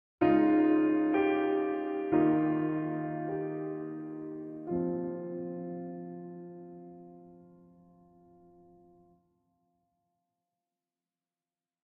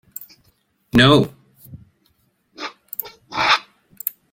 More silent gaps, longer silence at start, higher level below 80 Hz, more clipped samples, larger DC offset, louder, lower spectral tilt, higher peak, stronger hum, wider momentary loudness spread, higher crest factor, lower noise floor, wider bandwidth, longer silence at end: neither; about the same, 0.2 s vs 0.2 s; second, -68 dBFS vs -50 dBFS; neither; neither; second, -31 LUFS vs -18 LUFS; first, -7 dB/octave vs -5 dB/octave; second, -14 dBFS vs 0 dBFS; neither; about the same, 20 LU vs 20 LU; about the same, 18 dB vs 22 dB; first, under -90 dBFS vs -64 dBFS; second, 3.4 kHz vs 17 kHz; first, 4.45 s vs 0.25 s